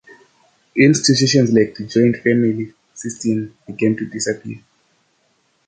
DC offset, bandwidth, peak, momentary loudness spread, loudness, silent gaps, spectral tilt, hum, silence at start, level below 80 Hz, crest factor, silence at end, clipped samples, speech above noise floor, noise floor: under 0.1%; 9.4 kHz; -2 dBFS; 18 LU; -17 LUFS; none; -5 dB/octave; none; 0.75 s; -56 dBFS; 16 dB; 1.1 s; under 0.1%; 46 dB; -63 dBFS